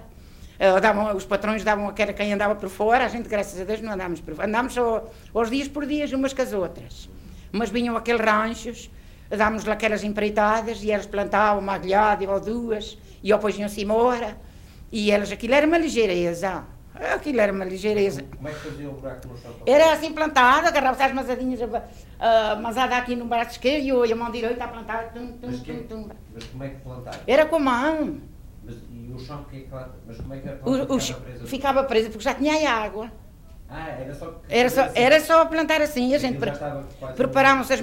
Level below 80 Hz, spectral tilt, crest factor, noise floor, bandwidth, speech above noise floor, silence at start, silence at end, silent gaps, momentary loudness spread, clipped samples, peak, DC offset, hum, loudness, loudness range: -44 dBFS; -4.5 dB/octave; 18 dB; -44 dBFS; 16 kHz; 21 dB; 0 s; 0 s; none; 18 LU; under 0.1%; -6 dBFS; under 0.1%; none; -22 LUFS; 6 LU